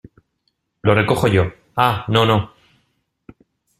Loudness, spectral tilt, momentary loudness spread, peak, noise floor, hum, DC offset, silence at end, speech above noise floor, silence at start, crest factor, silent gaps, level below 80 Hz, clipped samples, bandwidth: -17 LUFS; -6.5 dB/octave; 7 LU; -2 dBFS; -70 dBFS; none; under 0.1%; 1.35 s; 54 dB; 0.85 s; 18 dB; none; -48 dBFS; under 0.1%; 14.5 kHz